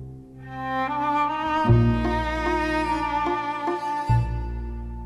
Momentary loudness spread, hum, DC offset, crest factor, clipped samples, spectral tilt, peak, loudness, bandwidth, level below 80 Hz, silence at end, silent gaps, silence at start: 14 LU; none; under 0.1%; 16 dB; under 0.1%; -7.5 dB/octave; -8 dBFS; -24 LUFS; 11 kHz; -34 dBFS; 0 s; none; 0 s